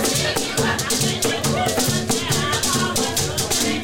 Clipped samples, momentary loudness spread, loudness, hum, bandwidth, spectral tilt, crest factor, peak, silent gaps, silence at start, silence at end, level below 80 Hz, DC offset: under 0.1%; 2 LU; -19 LUFS; none; 17 kHz; -3 dB/octave; 12 dB; -8 dBFS; none; 0 s; 0 s; -42 dBFS; under 0.1%